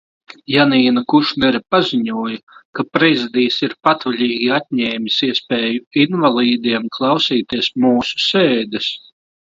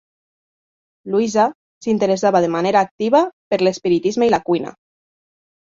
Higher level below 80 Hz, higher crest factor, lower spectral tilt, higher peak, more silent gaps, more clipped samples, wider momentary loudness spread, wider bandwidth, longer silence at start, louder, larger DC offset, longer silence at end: about the same, -58 dBFS vs -60 dBFS; about the same, 16 dB vs 16 dB; about the same, -5.5 dB/octave vs -5.5 dB/octave; about the same, 0 dBFS vs -2 dBFS; second, 2.43-2.47 s, 2.65-2.73 s, 5.87-5.91 s vs 1.55-1.81 s, 2.91-2.99 s, 3.33-3.51 s; neither; about the same, 7 LU vs 6 LU; about the same, 7.6 kHz vs 7.8 kHz; second, 0.5 s vs 1.05 s; about the same, -16 LUFS vs -18 LUFS; neither; second, 0.55 s vs 0.95 s